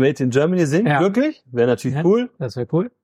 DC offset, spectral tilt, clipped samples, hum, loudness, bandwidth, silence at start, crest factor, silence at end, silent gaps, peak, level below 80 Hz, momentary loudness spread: under 0.1%; -7 dB/octave; under 0.1%; none; -19 LUFS; 13.5 kHz; 0 s; 14 dB; 0.15 s; none; -4 dBFS; -62 dBFS; 6 LU